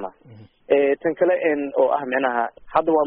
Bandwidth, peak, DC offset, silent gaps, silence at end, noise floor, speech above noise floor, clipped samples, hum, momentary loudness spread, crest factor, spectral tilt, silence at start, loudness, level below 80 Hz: 4.6 kHz; -4 dBFS; under 0.1%; none; 0 s; -47 dBFS; 27 dB; under 0.1%; none; 4 LU; 16 dB; -3.5 dB/octave; 0 s; -21 LUFS; -60 dBFS